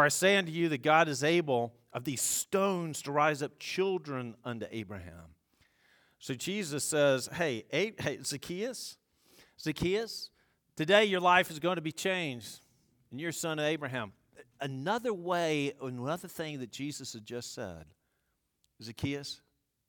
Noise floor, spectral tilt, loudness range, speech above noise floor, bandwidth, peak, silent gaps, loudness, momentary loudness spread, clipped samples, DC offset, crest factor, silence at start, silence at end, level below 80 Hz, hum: -80 dBFS; -3.5 dB/octave; 9 LU; 48 dB; 19 kHz; -10 dBFS; none; -32 LUFS; 17 LU; under 0.1%; under 0.1%; 24 dB; 0 s; 0.55 s; -66 dBFS; none